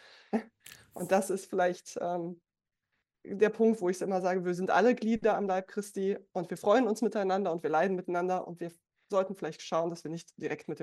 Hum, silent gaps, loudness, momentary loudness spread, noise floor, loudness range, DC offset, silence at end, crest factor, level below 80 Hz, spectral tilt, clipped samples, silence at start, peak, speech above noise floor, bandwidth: none; none; -31 LUFS; 14 LU; -85 dBFS; 4 LU; under 0.1%; 0 s; 18 dB; -72 dBFS; -5.5 dB/octave; under 0.1%; 0.35 s; -12 dBFS; 54 dB; 13 kHz